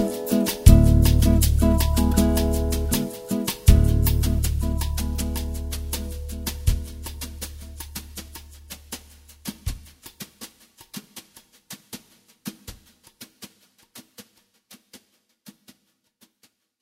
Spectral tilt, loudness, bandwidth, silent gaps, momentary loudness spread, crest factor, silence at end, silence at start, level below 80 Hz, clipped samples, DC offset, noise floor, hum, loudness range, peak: -6 dB/octave; -22 LUFS; 16.5 kHz; none; 24 LU; 24 dB; 1.85 s; 0 s; -26 dBFS; under 0.1%; under 0.1%; -67 dBFS; none; 23 LU; 0 dBFS